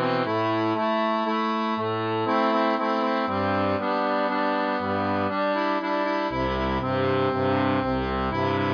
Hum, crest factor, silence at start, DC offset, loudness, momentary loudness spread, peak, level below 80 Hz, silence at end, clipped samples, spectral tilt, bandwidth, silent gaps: none; 12 dB; 0 s; under 0.1%; -24 LUFS; 3 LU; -12 dBFS; -46 dBFS; 0 s; under 0.1%; -7.5 dB/octave; 5.2 kHz; none